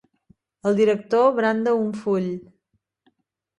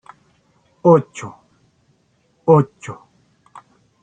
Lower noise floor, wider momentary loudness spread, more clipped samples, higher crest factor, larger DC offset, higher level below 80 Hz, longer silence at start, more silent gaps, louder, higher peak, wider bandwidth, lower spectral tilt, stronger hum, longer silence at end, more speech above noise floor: first, -73 dBFS vs -61 dBFS; second, 9 LU vs 22 LU; neither; about the same, 16 dB vs 18 dB; neither; second, -68 dBFS vs -62 dBFS; second, 0.65 s vs 0.85 s; neither; second, -21 LUFS vs -16 LUFS; second, -6 dBFS vs -2 dBFS; first, 10.5 kHz vs 9 kHz; second, -7 dB/octave vs -8.5 dB/octave; neither; about the same, 1.15 s vs 1.1 s; first, 53 dB vs 46 dB